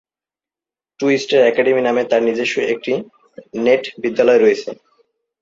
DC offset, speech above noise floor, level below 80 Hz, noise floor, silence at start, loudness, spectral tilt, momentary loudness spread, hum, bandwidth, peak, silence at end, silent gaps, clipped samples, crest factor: under 0.1%; over 74 dB; -64 dBFS; under -90 dBFS; 1 s; -16 LUFS; -4.5 dB/octave; 10 LU; none; 7.8 kHz; -2 dBFS; 0.7 s; none; under 0.1%; 16 dB